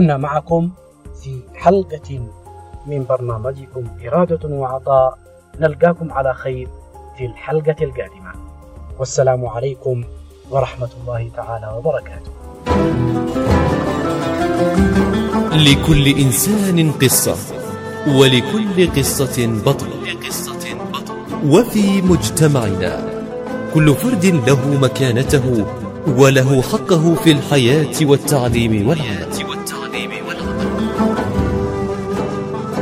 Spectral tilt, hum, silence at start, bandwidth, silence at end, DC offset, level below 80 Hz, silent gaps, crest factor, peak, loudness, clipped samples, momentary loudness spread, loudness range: -5.5 dB/octave; none; 0 s; 16 kHz; 0 s; under 0.1%; -34 dBFS; none; 16 dB; 0 dBFS; -16 LUFS; under 0.1%; 14 LU; 8 LU